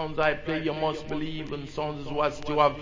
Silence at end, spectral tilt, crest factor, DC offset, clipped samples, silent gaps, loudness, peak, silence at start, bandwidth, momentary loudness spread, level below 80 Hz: 0 s; -6 dB/octave; 20 dB; under 0.1%; under 0.1%; none; -29 LUFS; -8 dBFS; 0 s; 7.6 kHz; 9 LU; -48 dBFS